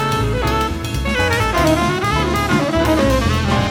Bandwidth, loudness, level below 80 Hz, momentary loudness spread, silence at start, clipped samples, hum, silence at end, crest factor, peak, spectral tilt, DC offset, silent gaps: 19 kHz; -17 LUFS; -26 dBFS; 4 LU; 0 s; under 0.1%; none; 0 s; 14 dB; -2 dBFS; -5.5 dB/octave; under 0.1%; none